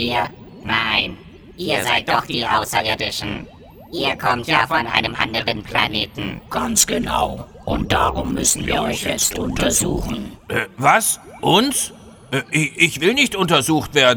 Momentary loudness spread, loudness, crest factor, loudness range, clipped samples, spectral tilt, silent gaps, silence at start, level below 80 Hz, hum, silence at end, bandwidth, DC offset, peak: 10 LU; -18 LUFS; 20 dB; 3 LU; under 0.1%; -2.5 dB/octave; none; 0 s; -38 dBFS; none; 0 s; over 20 kHz; under 0.1%; 0 dBFS